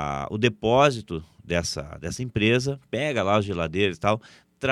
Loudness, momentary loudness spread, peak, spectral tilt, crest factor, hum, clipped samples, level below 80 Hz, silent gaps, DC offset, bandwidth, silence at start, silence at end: -24 LUFS; 13 LU; -4 dBFS; -5 dB/octave; 20 dB; none; under 0.1%; -48 dBFS; none; under 0.1%; 13.5 kHz; 0 s; 0 s